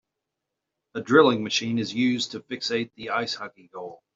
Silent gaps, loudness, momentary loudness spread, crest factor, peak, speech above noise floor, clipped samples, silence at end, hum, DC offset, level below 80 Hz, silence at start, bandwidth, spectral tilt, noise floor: none; -24 LUFS; 20 LU; 22 dB; -4 dBFS; 59 dB; under 0.1%; 0.2 s; none; under 0.1%; -70 dBFS; 0.95 s; 7.8 kHz; -4.5 dB/octave; -84 dBFS